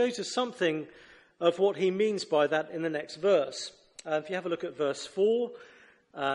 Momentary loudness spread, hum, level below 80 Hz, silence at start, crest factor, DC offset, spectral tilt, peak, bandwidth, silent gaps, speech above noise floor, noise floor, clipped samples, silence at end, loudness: 12 LU; none; -76 dBFS; 0 s; 18 dB; under 0.1%; -4.5 dB/octave; -12 dBFS; 11.5 kHz; none; 20 dB; -49 dBFS; under 0.1%; 0 s; -30 LUFS